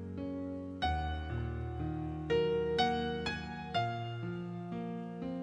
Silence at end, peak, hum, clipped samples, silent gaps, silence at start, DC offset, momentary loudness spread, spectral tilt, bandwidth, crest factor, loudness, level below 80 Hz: 0 s; -18 dBFS; none; under 0.1%; none; 0 s; under 0.1%; 9 LU; -6.5 dB/octave; 10 kHz; 18 dB; -36 LUFS; -48 dBFS